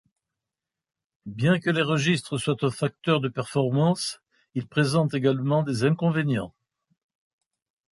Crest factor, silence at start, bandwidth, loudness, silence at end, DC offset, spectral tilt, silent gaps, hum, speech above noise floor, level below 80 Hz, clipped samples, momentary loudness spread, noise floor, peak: 18 dB; 1.25 s; 11.5 kHz; -25 LUFS; 1.4 s; under 0.1%; -6 dB/octave; none; none; 64 dB; -62 dBFS; under 0.1%; 11 LU; -88 dBFS; -8 dBFS